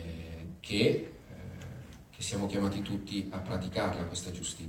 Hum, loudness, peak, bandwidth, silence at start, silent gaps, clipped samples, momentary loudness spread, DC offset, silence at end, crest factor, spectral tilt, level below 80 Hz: none; -34 LUFS; -14 dBFS; 17 kHz; 0 s; none; under 0.1%; 17 LU; under 0.1%; 0 s; 20 dB; -5 dB/octave; -56 dBFS